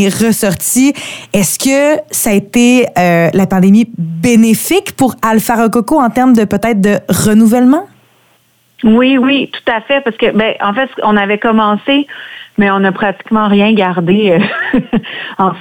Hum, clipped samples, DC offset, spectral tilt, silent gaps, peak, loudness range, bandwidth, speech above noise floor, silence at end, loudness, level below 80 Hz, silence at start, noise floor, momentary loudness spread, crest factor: none; under 0.1%; under 0.1%; -5 dB/octave; none; 0 dBFS; 2 LU; 19.5 kHz; 42 dB; 0 s; -10 LUFS; -44 dBFS; 0 s; -52 dBFS; 7 LU; 10 dB